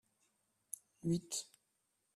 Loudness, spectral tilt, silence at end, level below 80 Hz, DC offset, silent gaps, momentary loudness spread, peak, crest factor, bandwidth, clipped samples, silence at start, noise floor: -42 LUFS; -5 dB/octave; 0.7 s; -76 dBFS; under 0.1%; none; 12 LU; -22 dBFS; 24 dB; 15 kHz; under 0.1%; 1.05 s; -83 dBFS